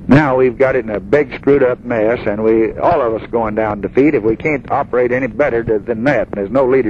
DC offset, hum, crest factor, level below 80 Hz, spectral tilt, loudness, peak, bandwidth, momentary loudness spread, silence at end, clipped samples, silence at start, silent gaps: under 0.1%; none; 12 dB; -38 dBFS; -9 dB/octave; -15 LUFS; -2 dBFS; 7.2 kHz; 5 LU; 0 s; under 0.1%; 0 s; none